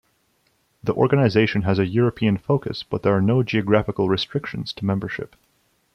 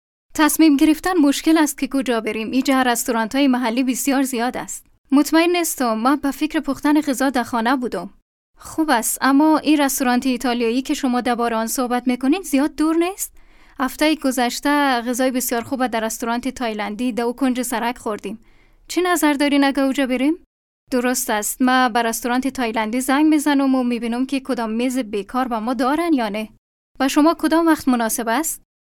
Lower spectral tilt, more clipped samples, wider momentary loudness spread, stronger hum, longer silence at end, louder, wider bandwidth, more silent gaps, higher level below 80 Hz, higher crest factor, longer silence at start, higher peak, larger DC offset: first, -8 dB/octave vs -3 dB/octave; neither; about the same, 10 LU vs 8 LU; neither; first, 0.7 s vs 0.35 s; about the same, -21 LUFS vs -19 LUFS; second, 6.6 kHz vs 17.5 kHz; second, none vs 4.98-5.04 s, 8.22-8.54 s, 20.46-20.87 s, 26.58-26.95 s; about the same, -52 dBFS vs -50 dBFS; about the same, 18 dB vs 16 dB; first, 0.85 s vs 0.35 s; about the same, -4 dBFS vs -4 dBFS; neither